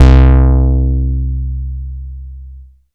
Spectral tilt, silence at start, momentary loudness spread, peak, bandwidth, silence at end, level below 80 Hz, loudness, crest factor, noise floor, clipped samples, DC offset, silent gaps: -9 dB/octave; 0 s; 22 LU; 0 dBFS; 4.9 kHz; 0.3 s; -12 dBFS; -13 LUFS; 10 dB; -35 dBFS; 1%; under 0.1%; none